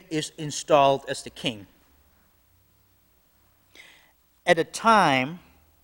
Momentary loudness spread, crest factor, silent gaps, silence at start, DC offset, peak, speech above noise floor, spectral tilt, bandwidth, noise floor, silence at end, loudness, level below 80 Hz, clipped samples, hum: 14 LU; 22 dB; none; 0.1 s; under 0.1%; -4 dBFS; 40 dB; -4 dB/octave; 16.5 kHz; -63 dBFS; 0.45 s; -23 LUFS; -62 dBFS; under 0.1%; none